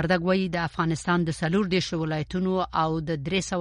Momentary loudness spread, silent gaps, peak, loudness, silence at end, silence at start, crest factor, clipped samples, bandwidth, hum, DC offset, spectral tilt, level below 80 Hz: 4 LU; none; -10 dBFS; -26 LUFS; 0 s; 0 s; 16 dB; under 0.1%; 11 kHz; none; under 0.1%; -5.5 dB/octave; -48 dBFS